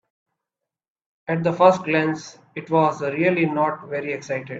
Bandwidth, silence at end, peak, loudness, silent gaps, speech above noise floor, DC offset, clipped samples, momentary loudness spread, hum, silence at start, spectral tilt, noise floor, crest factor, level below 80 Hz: 7.8 kHz; 0 s; -2 dBFS; -21 LUFS; none; 65 dB; under 0.1%; under 0.1%; 15 LU; none; 1.3 s; -6.5 dB/octave; -86 dBFS; 20 dB; -68 dBFS